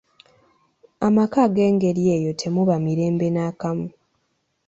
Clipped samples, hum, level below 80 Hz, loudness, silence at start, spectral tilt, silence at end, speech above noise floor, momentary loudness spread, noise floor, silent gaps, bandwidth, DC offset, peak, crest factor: under 0.1%; none; -58 dBFS; -21 LUFS; 1 s; -7.5 dB/octave; 0.8 s; 51 dB; 9 LU; -71 dBFS; none; 8 kHz; under 0.1%; -6 dBFS; 16 dB